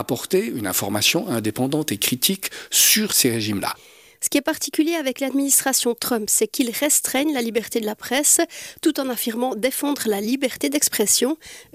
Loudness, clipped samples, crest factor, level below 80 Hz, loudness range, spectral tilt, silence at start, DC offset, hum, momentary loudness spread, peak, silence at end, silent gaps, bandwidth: -20 LUFS; under 0.1%; 16 dB; -62 dBFS; 2 LU; -2 dB/octave; 0 s; under 0.1%; none; 9 LU; -6 dBFS; 0.1 s; none; 16 kHz